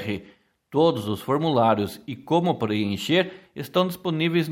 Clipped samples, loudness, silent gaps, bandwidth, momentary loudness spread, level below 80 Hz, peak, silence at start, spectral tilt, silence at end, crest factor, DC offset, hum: under 0.1%; -24 LUFS; none; 16.5 kHz; 10 LU; -62 dBFS; -6 dBFS; 0 s; -6.5 dB/octave; 0 s; 18 dB; under 0.1%; none